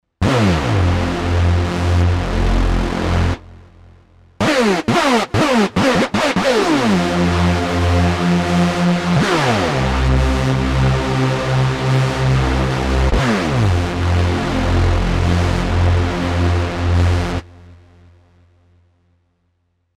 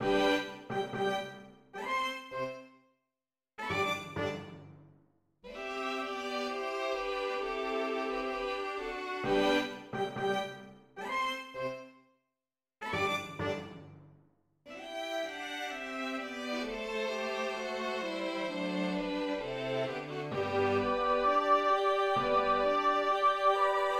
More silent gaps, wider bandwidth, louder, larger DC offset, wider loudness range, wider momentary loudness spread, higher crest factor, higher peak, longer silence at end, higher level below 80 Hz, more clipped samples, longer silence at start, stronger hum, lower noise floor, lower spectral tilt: neither; second, 12.5 kHz vs 15 kHz; first, -16 LUFS vs -33 LUFS; neither; second, 4 LU vs 9 LU; second, 4 LU vs 14 LU; second, 12 dB vs 18 dB; first, -4 dBFS vs -16 dBFS; first, 2.2 s vs 0 s; first, -24 dBFS vs -62 dBFS; neither; first, 0.2 s vs 0 s; neither; second, -65 dBFS vs under -90 dBFS; first, -6 dB/octave vs -4.5 dB/octave